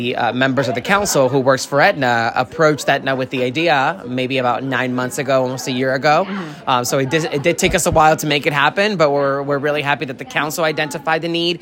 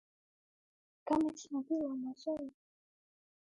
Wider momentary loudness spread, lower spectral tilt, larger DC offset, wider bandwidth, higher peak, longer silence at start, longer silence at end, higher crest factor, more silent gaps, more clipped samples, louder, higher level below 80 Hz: second, 6 LU vs 11 LU; second, -4 dB/octave vs -5.5 dB/octave; neither; first, 16.5 kHz vs 11 kHz; first, 0 dBFS vs -22 dBFS; second, 0 s vs 1.05 s; second, 0 s vs 0.95 s; about the same, 16 dB vs 18 dB; neither; neither; first, -17 LUFS vs -38 LUFS; first, -44 dBFS vs -72 dBFS